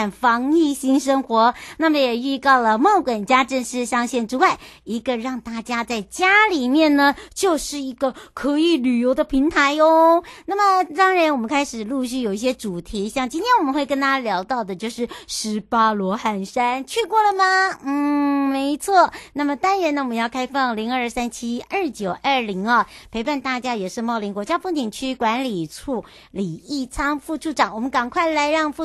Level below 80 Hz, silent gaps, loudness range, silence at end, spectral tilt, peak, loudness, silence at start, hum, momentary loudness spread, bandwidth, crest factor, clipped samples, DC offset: -50 dBFS; none; 6 LU; 0 s; -4 dB/octave; -2 dBFS; -20 LUFS; 0 s; none; 11 LU; 12.5 kHz; 18 dB; under 0.1%; under 0.1%